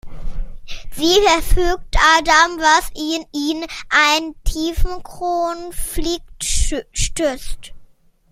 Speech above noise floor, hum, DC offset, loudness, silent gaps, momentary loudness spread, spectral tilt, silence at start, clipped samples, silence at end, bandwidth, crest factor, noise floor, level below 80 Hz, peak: 30 dB; none; under 0.1%; -17 LUFS; none; 21 LU; -2.5 dB/octave; 0.05 s; under 0.1%; 0.45 s; 16 kHz; 18 dB; -47 dBFS; -24 dBFS; 0 dBFS